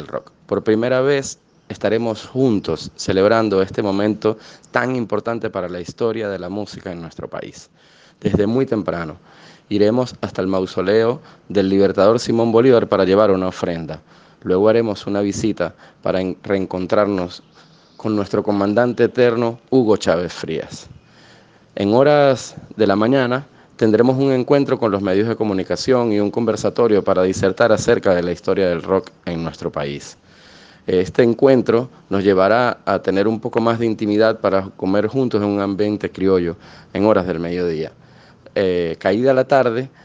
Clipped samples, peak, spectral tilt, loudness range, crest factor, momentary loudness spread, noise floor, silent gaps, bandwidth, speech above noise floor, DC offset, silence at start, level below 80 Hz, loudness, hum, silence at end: under 0.1%; 0 dBFS; -6.5 dB/octave; 5 LU; 18 dB; 13 LU; -48 dBFS; none; 9.6 kHz; 31 dB; under 0.1%; 0 s; -54 dBFS; -18 LUFS; none; 0.15 s